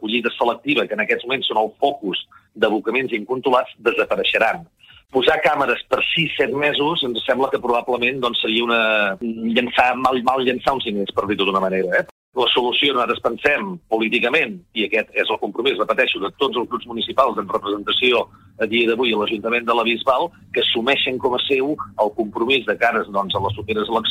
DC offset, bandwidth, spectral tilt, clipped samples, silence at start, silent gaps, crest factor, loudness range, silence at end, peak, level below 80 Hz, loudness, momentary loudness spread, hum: under 0.1%; 16 kHz; -5 dB/octave; under 0.1%; 0 s; 12.11-12.32 s; 18 dB; 2 LU; 0 s; -2 dBFS; -54 dBFS; -19 LUFS; 6 LU; none